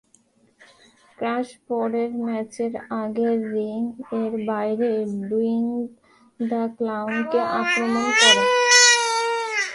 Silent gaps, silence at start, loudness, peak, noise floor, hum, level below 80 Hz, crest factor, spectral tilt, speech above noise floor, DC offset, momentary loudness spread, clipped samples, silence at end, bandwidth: none; 1.2 s; -21 LUFS; 0 dBFS; -60 dBFS; none; -68 dBFS; 22 dB; -1.5 dB/octave; 37 dB; under 0.1%; 15 LU; under 0.1%; 0 s; 11.5 kHz